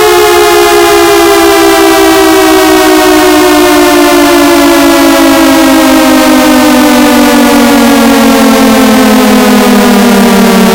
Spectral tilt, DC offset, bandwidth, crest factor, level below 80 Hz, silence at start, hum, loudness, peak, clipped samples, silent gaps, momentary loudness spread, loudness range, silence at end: -3.5 dB/octave; under 0.1%; over 20 kHz; 4 dB; -30 dBFS; 0 s; none; -3 LUFS; 0 dBFS; 20%; none; 0 LU; 0 LU; 0 s